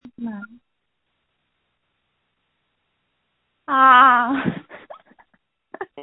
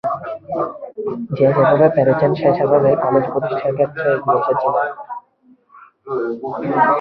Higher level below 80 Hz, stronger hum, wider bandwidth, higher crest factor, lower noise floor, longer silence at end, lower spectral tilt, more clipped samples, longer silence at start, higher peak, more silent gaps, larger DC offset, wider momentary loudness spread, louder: second, -64 dBFS vs -58 dBFS; neither; second, 4.1 kHz vs 5.4 kHz; first, 22 dB vs 16 dB; first, -76 dBFS vs -53 dBFS; about the same, 0 s vs 0 s; second, -8 dB/octave vs -10.5 dB/octave; neither; first, 0.2 s vs 0.05 s; about the same, 0 dBFS vs -2 dBFS; neither; neither; first, 26 LU vs 13 LU; first, -14 LUFS vs -17 LUFS